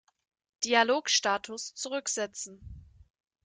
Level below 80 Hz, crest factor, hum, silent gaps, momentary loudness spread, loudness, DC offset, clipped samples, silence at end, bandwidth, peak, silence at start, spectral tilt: -60 dBFS; 22 dB; none; none; 16 LU; -28 LUFS; under 0.1%; under 0.1%; 0.65 s; 11 kHz; -10 dBFS; 0.6 s; -1 dB/octave